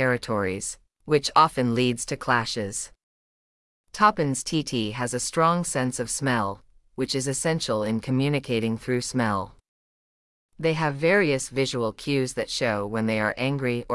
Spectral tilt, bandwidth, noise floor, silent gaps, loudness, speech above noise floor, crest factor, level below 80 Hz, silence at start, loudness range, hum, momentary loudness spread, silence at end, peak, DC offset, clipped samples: -4.5 dB/octave; 12 kHz; under -90 dBFS; 3.03-3.84 s, 9.68-10.49 s; -25 LUFS; over 65 dB; 20 dB; -54 dBFS; 0 s; 2 LU; none; 10 LU; 0 s; -6 dBFS; under 0.1%; under 0.1%